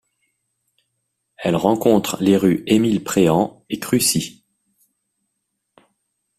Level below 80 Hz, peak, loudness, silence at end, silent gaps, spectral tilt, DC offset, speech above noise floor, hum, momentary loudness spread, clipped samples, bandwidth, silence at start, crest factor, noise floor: -54 dBFS; -2 dBFS; -18 LUFS; 2.1 s; none; -5 dB/octave; under 0.1%; 59 dB; none; 8 LU; under 0.1%; 16 kHz; 1.4 s; 18 dB; -76 dBFS